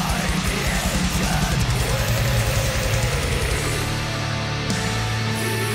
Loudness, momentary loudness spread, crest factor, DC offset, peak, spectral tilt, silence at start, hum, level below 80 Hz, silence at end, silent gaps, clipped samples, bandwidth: -22 LUFS; 3 LU; 12 dB; under 0.1%; -10 dBFS; -4 dB/octave; 0 s; none; -28 dBFS; 0 s; none; under 0.1%; 16.5 kHz